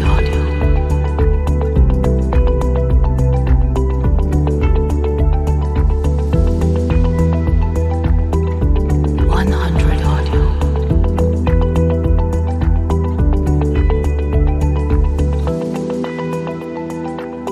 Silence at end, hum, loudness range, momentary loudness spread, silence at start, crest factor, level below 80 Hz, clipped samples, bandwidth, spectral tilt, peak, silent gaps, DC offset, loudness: 0 s; none; 1 LU; 4 LU; 0 s; 12 dB; -16 dBFS; under 0.1%; 8 kHz; -8.5 dB/octave; -2 dBFS; none; under 0.1%; -16 LUFS